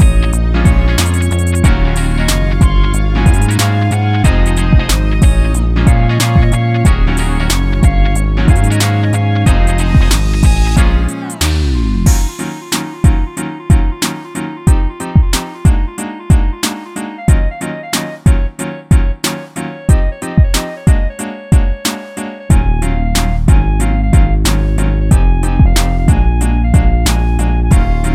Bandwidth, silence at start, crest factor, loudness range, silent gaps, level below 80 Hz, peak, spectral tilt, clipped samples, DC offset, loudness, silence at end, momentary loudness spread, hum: 16 kHz; 0 s; 10 dB; 3 LU; none; -12 dBFS; 0 dBFS; -5.5 dB/octave; under 0.1%; under 0.1%; -13 LUFS; 0 s; 7 LU; none